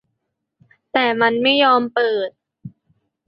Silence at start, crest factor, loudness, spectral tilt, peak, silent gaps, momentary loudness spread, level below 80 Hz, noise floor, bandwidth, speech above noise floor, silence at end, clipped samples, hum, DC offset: 0.95 s; 18 dB; -17 LUFS; -7.5 dB/octave; -2 dBFS; none; 10 LU; -68 dBFS; -76 dBFS; 5.6 kHz; 59 dB; 0.6 s; under 0.1%; none; under 0.1%